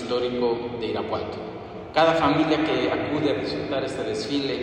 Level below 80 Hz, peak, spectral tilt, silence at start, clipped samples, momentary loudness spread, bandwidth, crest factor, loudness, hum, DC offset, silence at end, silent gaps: -54 dBFS; -8 dBFS; -5.5 dB/octave; 0 s; under 0.1%; 9 LU; 10 kHz; 18 dB; -24 LUFS; none; under 0.1%; 0 s; none